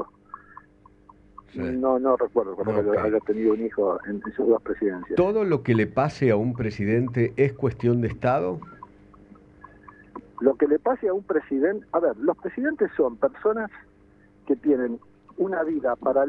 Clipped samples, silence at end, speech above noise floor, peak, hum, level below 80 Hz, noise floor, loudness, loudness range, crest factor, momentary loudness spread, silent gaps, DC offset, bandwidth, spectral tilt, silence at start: under 0.1%; 0 s; 32 dB; -6 dBFS; none; -54 dBFS; -55 dBFS; -24 LUFS; 3 LU; 20 dB; 9 LU; none; under 0.1%; 7.2 kHz; -9 dB/octave; 0 s